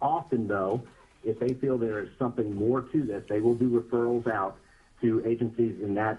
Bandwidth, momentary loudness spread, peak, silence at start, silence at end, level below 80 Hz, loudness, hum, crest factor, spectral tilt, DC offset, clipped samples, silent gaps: 6.6 kHz; 6 LU; -12 dBFS; 0 s; 0 s; -60 dBFS; -29 LUFS; none; 16 dB; -9 dB/octave; under 0.1%; under 0.1%; none